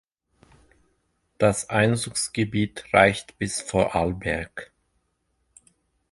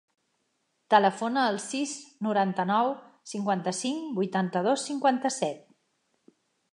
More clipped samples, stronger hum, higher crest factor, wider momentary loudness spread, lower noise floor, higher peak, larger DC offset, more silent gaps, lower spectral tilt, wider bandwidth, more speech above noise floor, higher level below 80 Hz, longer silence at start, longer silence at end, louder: neither; neither; about the same, 24 dB vs 24 dB; about the same, 11 LU vs 10 LU; about the same, -73 dBFS vs -76 dBFS; first, -2 dBFS vs -6 dBFS; neither; neither; about the same, -4.5 dB/octave vs -4.5 dB/octave; about the same, 11.5 kHz vs 11.5 kHz; about the same, 49 dB vs 49 dB; first, -48 dBFS vs -82 dBFS; first, 1.4 s vs 0.9 s; first, 1.5 s vs 1.15 s; first, -23 LUFS vs -27 LUFS